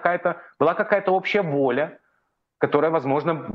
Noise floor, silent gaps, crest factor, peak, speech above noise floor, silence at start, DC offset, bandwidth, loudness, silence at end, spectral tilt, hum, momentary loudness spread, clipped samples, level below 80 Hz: -72 dBFS; none; 20 dB; -2 dBFS; 50 dB; 0 s; under 0.1%; 6.8 kHz; -22 LUFS; 0 s; -8 dB/octave; none; 6 LU; under 0.1%; -66 dBFS